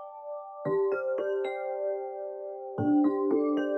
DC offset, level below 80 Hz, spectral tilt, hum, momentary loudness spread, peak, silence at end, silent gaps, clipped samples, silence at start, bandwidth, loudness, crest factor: under 0.1%; -78 dBFS; -9 dB/octave; none; 13 LU; -16 dBFS; 0 s; none; under 0.1%; 0 s; 4.1 kHz; -30 LUFS; 14 dB